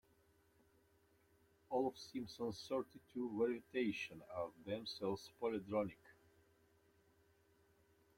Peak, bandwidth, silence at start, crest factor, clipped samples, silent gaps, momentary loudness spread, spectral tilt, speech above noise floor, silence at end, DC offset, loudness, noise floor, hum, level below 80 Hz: -26 dBFS; 16.5 kHz; 1.7 s; 20 dB; under 0.1%; none; 7 LU; -5.5 dB/octave; 31 dB; 2.05 s; under 0.1%; -44 LUFS; -75 dBFS; none; -80 dBFS